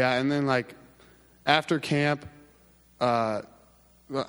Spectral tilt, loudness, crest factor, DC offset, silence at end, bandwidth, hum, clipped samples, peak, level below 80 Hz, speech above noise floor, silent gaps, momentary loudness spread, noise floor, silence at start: -5.5 dB/octave; -27 LUFS; 24 dB; under 0.1%; 0.05 s; over 20 kHz; none; under 0.1%; -4 dBFS; -64 dBFS; 33 dB; none; 11 LU; -59 dBFS; 0 s